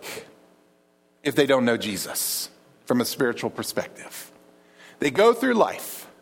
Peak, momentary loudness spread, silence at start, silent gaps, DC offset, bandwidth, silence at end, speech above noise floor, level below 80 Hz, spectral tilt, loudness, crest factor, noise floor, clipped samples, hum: -4 dBFS; 18 LU; 0 s; none; under 0.1%; 17.5 kHz; 0.15 s; 39 dB; -68 dBFS; -3.5 dB/octave; -23 LUFS; 20 dB; -62 dBFS; under 0.1%; none